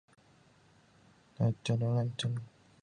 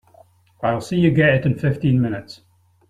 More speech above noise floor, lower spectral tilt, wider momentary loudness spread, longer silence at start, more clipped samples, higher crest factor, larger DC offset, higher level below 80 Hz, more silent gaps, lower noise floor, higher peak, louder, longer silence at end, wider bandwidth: about the same, 32 dB vs 34 dB; second, -6.5 dB/octave vs -8 dB/octave; about the same, 9 LU vs 9 LU; first, 1.4 s vs 0.6 s; neither; about the same, 18 dB vs 18 dB; neither; second, -66 dBFS vs -48 dBFS; neither; first, -64 dBFS vs -52 dBFS; second, -18 dBFS vs -4 dBFS; second, -34 LUFS vs -19 LUFS; second, 0.35 s vs 0.55 s; about the same, 10 kHz vs 11 kHz